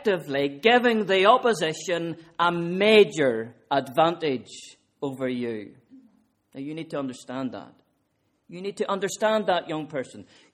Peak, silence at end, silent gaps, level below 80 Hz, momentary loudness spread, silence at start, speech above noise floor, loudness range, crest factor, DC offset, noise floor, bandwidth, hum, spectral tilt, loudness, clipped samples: -4 dBFS; 0.3 s; none; -70 dBFS; 17 LU; 0 s; 47 dB; 13 LU; 22 dB; under 0.1%; -71 dBFS; 14.5 kHz; none; -4.5 dB/octave; -24 LUFS; under 0.1%